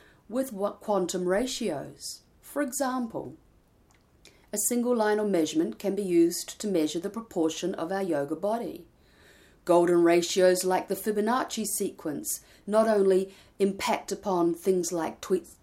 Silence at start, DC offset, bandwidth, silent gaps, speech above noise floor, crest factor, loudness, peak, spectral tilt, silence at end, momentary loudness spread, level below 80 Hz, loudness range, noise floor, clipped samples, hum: 0.3 s; under 0.1%; 16 kHz; none; 35 dB; 18 dB; -27 LUFS; -10 dBFS; -4.5 dB/octave; 0.1 s; 12 LU; -64 dBFS; 6 LU; -62 dBFS; under 0.1%; none